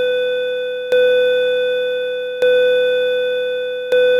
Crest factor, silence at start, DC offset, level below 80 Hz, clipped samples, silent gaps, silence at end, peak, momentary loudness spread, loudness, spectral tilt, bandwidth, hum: 10 dB; 0 s; under 0.1%; -62 dBFS; under 0.1%; none; 0 s; -6 dBFS; 7 LU; -17 LUFS; -2.5 dB/octave; 6.8 kHz; none